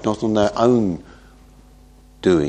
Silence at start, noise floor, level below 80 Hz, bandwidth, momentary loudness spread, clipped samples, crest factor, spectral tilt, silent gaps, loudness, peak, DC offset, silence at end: 0 s; -47 dBFS; -46 dBFS; 9.2 kHz; 8 LU; under 0.1%; 18 dB; -7 dB/octave; none; -19 LUFS; -2 dBFS; under 0.1%; 0 s